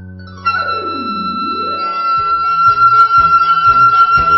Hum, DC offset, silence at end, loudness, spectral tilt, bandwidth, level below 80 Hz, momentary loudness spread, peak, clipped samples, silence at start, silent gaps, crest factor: none; under 0.1%; 0 s; -11 LUFS; -6 dB/octave; 6 kHz; -40 dBFS; 11 LU; 0 dBFS; under 0.1%; 0 s; none; 10 dB